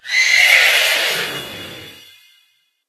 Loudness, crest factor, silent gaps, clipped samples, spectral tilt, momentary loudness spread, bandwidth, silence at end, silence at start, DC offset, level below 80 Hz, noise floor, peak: -12 LUFS; 18 dB; none; under 0.1%; 1 dB/octave; 22 LU; 13.5 kHz; 0.95 s; 0.05 s; under 0.1%; -62 dBFS; -60 dBFS; 0 dBFS